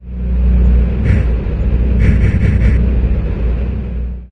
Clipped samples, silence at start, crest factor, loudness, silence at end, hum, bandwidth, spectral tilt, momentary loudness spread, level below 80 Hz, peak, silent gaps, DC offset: under 0.1%; 0 s; 12 dB; -15 LUFS; 0.05 s; none; 3.7 kHz; -9.5 dB/octave; 8 LU; -14 dBFS; -2 dBFS; none; under 0.1%